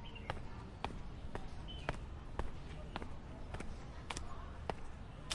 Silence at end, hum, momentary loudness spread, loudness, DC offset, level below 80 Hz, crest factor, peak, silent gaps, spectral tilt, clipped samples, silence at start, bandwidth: 0 s; none; 6 LU; -48 LUFS; under 0.1%; -50 dBFS; 24 dB; -22 dBFS; none; -4.5 dB/octave; under 0.1%; 0 s; 11.5 kHz